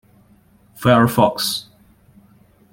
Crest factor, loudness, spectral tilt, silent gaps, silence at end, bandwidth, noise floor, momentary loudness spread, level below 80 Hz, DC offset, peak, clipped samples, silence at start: 18 dB; -17 LUFS; -5 dB/octave; none; 1.1 s; 17 kHz; -53 dBFS; 8 LU; -52 dBFS; under 0.1%; -2 dBFS; under 0.1%; 0.8 s